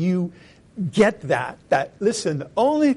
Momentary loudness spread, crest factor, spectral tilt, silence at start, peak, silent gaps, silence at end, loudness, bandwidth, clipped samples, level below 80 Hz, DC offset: 10 LU; 16 dB; -6 dB/octave; 0 s; -6 dBFS; none; 0 s; -22 LUFS; 11.5 kHz; under 0.1%; -58 dBFS; under 0.1%